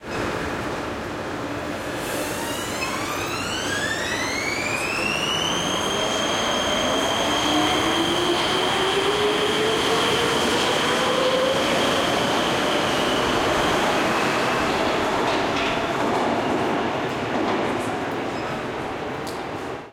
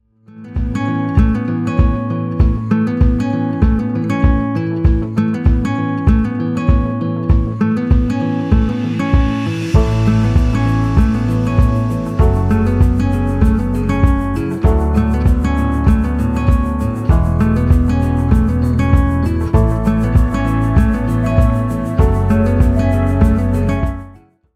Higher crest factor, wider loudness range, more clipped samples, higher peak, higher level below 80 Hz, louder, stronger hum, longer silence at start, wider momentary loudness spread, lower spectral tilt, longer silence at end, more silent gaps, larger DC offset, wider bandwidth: about the same, 14 dB vs 14 dB; first, 5 LU vs 1 LU; neither; second, -8 dBFS vs 0 dBFS; second, -48 dBFS vs -18 dBFS; second, -22 LUFS vs -15 LUFS; neither; second, 0 s vs 0.35 s; first, 8 LU vs 4 LU; second, -3 dB/octave vs -9 dB/octave; second, 0 s vs 0.45 s; neither; neither; first, 16.5 kHz vs 10.5 kHz